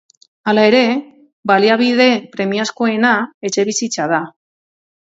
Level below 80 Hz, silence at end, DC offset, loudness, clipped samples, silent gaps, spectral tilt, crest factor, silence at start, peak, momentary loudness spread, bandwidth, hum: -66 dBFS; 0.75 s; under 0.1%; -15 LUFS; under 0.1%; 1.33-1.43 s, 3.34-3.41 s; -3.5 dB/octave; 16 dB; 0.45 s; 0 dBFS; 9 LU; 8 kHz; none